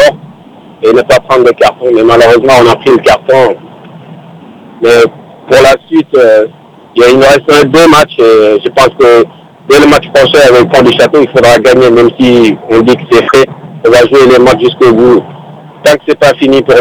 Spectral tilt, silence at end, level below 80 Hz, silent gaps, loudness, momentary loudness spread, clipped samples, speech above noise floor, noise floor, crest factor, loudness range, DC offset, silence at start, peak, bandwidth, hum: -5 dB/octave; 0 s; -36 dBFS; none; -5 LUFS; 5 LU; 10%; 29 dB; -33 dBFS; 4 dB; 4 LU; under 0.1%; 0 s; 0 dBFS; 19.5 kHz; none